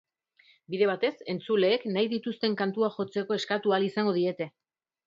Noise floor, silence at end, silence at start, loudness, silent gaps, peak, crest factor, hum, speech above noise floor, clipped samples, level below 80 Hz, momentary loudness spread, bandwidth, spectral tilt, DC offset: -63 dBFS; 0.6 s; 0.7 s; -28 LUFS; none; -12 dBFS; 16 dB; none; 36 dB; under 0.1%; -78 dBFS; 7 LU; 7.6 kHz; -6 dB/octave; under 0.1%